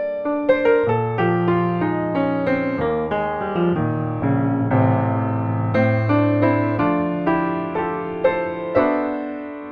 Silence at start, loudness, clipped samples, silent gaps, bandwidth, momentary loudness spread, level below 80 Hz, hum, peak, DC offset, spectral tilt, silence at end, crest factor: 0 s; -20 LUFS; under 0.1%; none; 5 kHz; 6 LU; -50 dBFS; none; -4 dBFS; under 0.1%; -10.5 dB/octave; 0 s; 16 dB